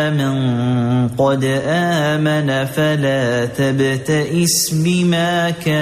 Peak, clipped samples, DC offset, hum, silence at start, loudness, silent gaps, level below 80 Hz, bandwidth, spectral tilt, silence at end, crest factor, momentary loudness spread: -4 dBFS; under 0.1%; under 0.1%; none; 0 s; -16 LUFS; none; -50 dBFS; 15 kHz; -5 dB/octave; 0 s; 12 dB; 3 LU